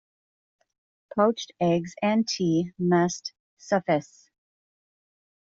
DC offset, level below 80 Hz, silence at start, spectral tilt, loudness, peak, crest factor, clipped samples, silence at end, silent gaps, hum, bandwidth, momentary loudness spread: under 0.1%; -68 dBFS; 1.15 s; -5.5 dB/octave; -25 LUFS; -10 dBFS; 18 dB; under 0.1%; 1.5 s; 3.40-3.57 s; none; 7.8 kHz; 5 LU